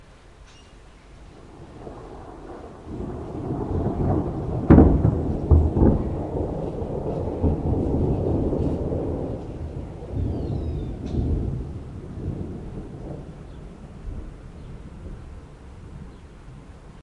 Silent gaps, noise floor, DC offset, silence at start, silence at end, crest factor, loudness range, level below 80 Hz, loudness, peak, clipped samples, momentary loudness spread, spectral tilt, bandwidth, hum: none; -47 dBFS; under 0.1%; 0 s; 0 s; 24 dB; 20 LU; -32 dBFS; -24 LUFS; 0 dBFS; under 0.1%; 22 LU; -10.5 dB/octave; 6.2 kHz; none